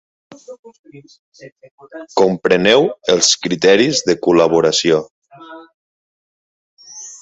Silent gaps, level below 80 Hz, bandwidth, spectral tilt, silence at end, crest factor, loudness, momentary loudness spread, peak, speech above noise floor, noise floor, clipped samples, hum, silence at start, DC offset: 0.59-0.63 s, 0.79-0.84 s, 1.19-1.32 s, 1.52-1.56 s, 1.71-1.78 s, 5.11-5.22 s, 5.74-6.77 s; -56 dBFS; 8.2 kHz; -3 dB/octave; 0.05 s; 16 dB; -13 LUFS; 16 LU; 0 dBFS; 23 dB; -38 dBFS; under 0.1%; none; 0.5 s; under 0.1%